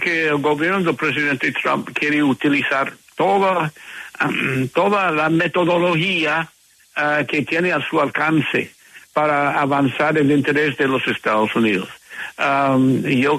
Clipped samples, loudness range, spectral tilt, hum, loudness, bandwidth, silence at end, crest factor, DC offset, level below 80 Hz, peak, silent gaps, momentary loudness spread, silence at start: under 0.1%; 1 LU; -6 dB/octave; none; -18 LUFS; 13.5 kHz; 0 s; 12 dB; under 0.1%; -60 dBFS; -6 dBFS; none; 7 LU; 0 s